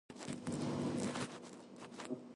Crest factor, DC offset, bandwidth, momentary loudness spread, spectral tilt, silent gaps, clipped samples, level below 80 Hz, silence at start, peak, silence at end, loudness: 18 dB; under 0.1%; 11.5 kHz; 14 LU; -5 dB/octave; none; under 0.1%; -70 dBFS; 0.1 s; -26 dBFS; 0 s; -43 LUFS